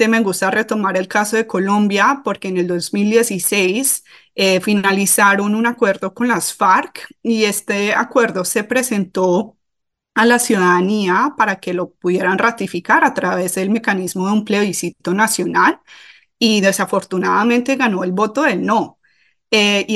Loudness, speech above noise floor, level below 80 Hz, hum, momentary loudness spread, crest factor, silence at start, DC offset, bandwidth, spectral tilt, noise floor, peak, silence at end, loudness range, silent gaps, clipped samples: -16 LUFS; 61 dB; -64 dBFS; none; 7 LU; 16 dB; 0 s; under 0.1%; 15 kHz; -3.5 dB/octave; -77 dBFS; -2 dBFS; 0 s; 2 LU; none; under 0.1%